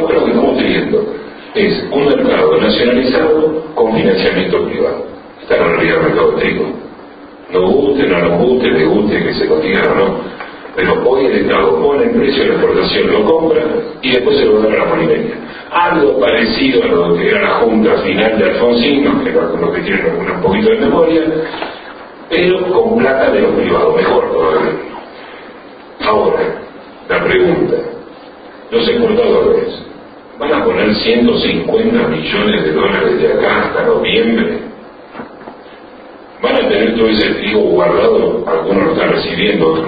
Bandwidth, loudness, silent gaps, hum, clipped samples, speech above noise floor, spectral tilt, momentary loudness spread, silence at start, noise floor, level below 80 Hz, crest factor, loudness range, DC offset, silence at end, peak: 5 kHz; -12 LUFS; none; none; under 0.1%; 23 dB; -9.5 dB/octave; 12 LU; 0 s; -34 dBFS; -40 dBFS; 12 dB; 3 LU; under 0.1%; 0 s; 0 dBFS